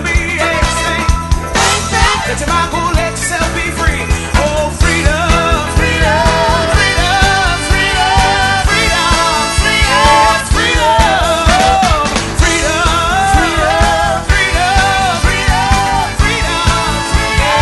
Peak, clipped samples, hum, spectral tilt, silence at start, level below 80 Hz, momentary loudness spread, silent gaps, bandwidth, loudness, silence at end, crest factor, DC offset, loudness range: 0 dBFS; 0.1%; none; -3.5 dB/octave; 0 s; -18 dBFS; 5 LU; none; 12 kHz; -11 LUFS; 0 s; 12 dB; under 0.1%; 3 LU